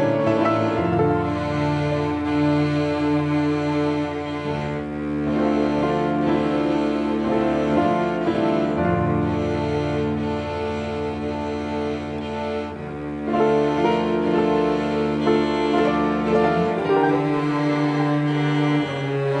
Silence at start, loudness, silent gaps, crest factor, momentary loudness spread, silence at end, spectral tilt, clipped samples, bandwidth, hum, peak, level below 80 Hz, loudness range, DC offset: 0 s; -22 LUFS; none; 14 dB; 7 LU; 0 s; -7.5 dB/octave; under 0.1%; 9.6 kHz; none; -8 dBFS; -46 dBFS; 4 LU; under 0.1%